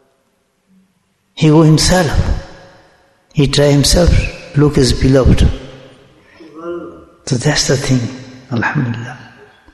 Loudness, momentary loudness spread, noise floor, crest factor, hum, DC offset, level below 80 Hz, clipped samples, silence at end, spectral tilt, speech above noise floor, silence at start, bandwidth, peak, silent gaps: -13 LUFS; 20 LU; -61 dBFS; 14 dB; none; under 0.1%; -24 dBFS; under 0.1%; 0.5 s; -5 dB/octave; 50 dB; 1.35 s; 12.5 kHz; 0 dBFS; none